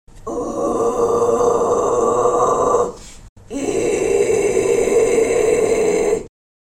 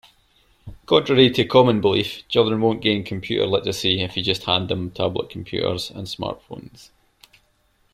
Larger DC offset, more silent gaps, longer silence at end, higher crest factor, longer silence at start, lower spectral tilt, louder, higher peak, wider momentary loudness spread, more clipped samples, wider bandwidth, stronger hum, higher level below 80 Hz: neither; first, 3.29-3.36 s vs none; second, 0.35 s vs 1.25 s; second, 14 dB vs 20 dB; second, 0.15 s vs 0.65 s; about the same, -4.5 dB/octave vs -5.5 dB/octave; first, -17 LUFS vs -20 LUFS; second, -4 dBFS vs 0 dBFS; second, 8 LU vs 13 LU; neither; about the same, 14 kHz vs 15 kHz; neither; first, -42 dBFS vs -52 dBFS